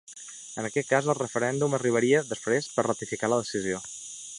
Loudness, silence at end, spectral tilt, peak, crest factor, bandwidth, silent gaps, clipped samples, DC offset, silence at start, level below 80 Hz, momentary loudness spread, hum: -27 LUFS; 0 s; -4.5 dB/octave; -8 dBFS; 20 dB; 11.5 kHz; none; under 0.1%; under 0.1%; 0.1 s; -68 dBFS; 13 LU; none